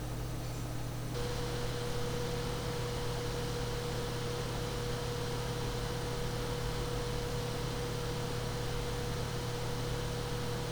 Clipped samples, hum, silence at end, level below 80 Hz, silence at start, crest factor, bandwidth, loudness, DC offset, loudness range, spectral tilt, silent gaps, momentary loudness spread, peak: under 0.1%; none; 0 s; -44 dBFS; 0 s; 14 dB; over 20 kHz; -37 LUFS; under 0.1%; 0 LU; -5 dB/octave; none; 1 LU; -22 dBFS